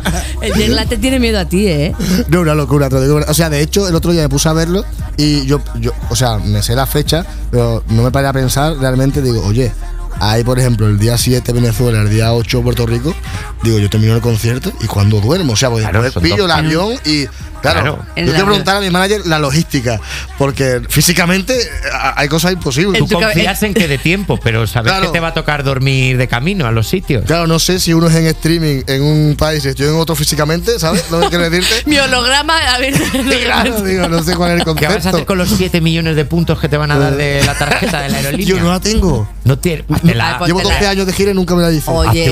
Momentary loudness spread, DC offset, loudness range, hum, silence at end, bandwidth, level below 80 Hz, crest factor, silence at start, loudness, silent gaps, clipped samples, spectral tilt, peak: 5 LU; under 0.1%; 2 LU; none; 0 s; 16.5 kHz; -24 dBFS; 12 dB; 0 s; -13 LUFS; none; under 0.1%; -5 dB/octave; 0 dBFS